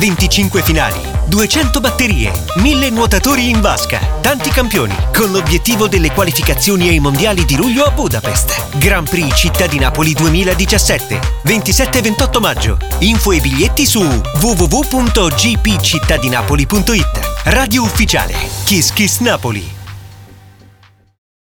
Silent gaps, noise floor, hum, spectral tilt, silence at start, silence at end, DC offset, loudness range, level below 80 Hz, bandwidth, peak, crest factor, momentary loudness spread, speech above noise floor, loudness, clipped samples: none; -46 dBFS; none; -4 dB/octave; 0 s; 1.1 s; 0.1%; 1 LU; -18 dBFS; over 20 kHz; 0 dBFS; 12 dB; 4 LU; 34 dB; -12 LUFS; under 0.1%